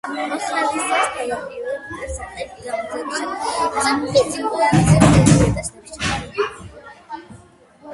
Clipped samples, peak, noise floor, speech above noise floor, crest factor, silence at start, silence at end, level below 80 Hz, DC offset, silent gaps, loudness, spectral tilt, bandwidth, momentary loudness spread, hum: under 0.1%; 0 dBFS; -47 dBFS; 29 dB; 20 dB; 0.05 s; 0 s; -36 dBFS; under 0.1%; none; -19 LUFS; -5.5 dB/octave; 11.5 kHz; 18 LU; none